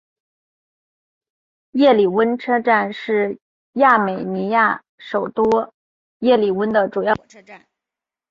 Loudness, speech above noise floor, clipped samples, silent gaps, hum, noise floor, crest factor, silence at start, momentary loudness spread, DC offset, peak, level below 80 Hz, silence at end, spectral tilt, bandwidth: -18 LUFS; 70 dB; under 0.1%; 3.42-3.73 s, 4.89-4.98 s, 5.74-6.20 s; none; -87 dBFS; 18 dB; 1.75 s; 11 LU; under 0.1%; -2 dBFS; -60 dBFS; 0.75 s; -7 dB/octave; 7.2 kHz